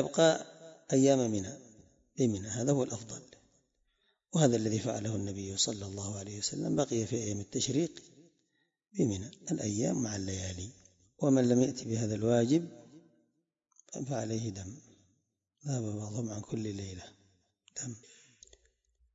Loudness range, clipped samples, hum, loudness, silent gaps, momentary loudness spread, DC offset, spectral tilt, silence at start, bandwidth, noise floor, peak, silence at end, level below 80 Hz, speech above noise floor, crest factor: 9 LU; under 0.1%; none; -32 LUFS; none; 18 LU; under 0.1%; -5 dB/octave; 0 s; 8 kHz; -79 dBFS; -12 dBFS; 1.15 s; -70 dBFS; 47 dB; 22 dB